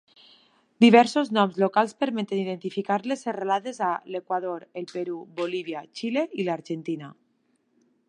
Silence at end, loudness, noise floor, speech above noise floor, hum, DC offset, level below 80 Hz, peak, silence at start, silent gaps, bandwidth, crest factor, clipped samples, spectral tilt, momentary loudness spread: 1 s; -25 LUFS; -70 dBFS; 45 dB; none; under 0.1%; -80 dBFS; -2 dBFS; 0.8 s; none; 10.5 kHz; 24 dB; under 0.1%; -5.5 dB/octave; 15 LU